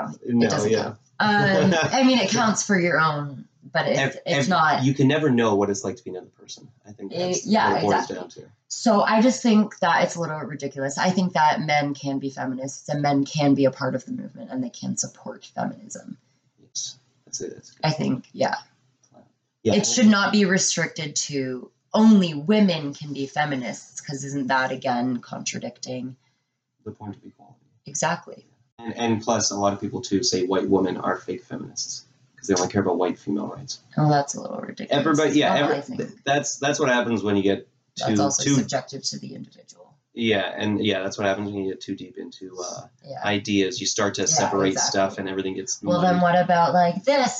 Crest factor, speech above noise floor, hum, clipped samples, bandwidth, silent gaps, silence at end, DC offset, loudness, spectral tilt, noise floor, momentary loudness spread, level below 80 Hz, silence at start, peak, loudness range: 18 dB; 51 dB; none; under 0.1%; 9 kHz; 28.72-28.78 s; 0 s; under 0.1%; -22 LUFS; -4 dB/octave; -74 dBFS; 16 LU; -68 dBFS; 0 s; -6 dBFS; 9 LU